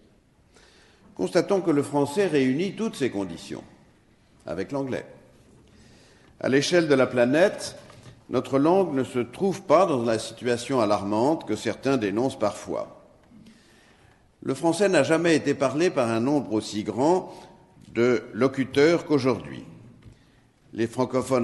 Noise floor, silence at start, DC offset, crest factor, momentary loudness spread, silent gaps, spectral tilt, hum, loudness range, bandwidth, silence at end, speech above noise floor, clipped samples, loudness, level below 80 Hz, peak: -59 dBFS; 1.2 s; under 0.1%; 18 dB; 13 LU; none; -5.5 dB/octave; none; 6 LU; 12 kHz; 0 s; 36 dB; under 0.1%; -24 LUFS; -62 dBFS; -6 dBFS